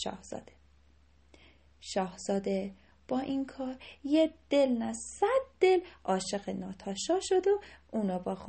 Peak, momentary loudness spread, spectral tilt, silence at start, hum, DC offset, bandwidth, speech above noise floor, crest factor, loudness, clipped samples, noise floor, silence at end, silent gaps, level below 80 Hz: -14 dBFS; 13 LU; -5 dB/octave; 0 s; none; under 0.1%; 8.8 kHz; 32 dB; 20 dB; -32 LUFS; under 0.1%; -64 dBFS; 0 s; none; -62 dBFS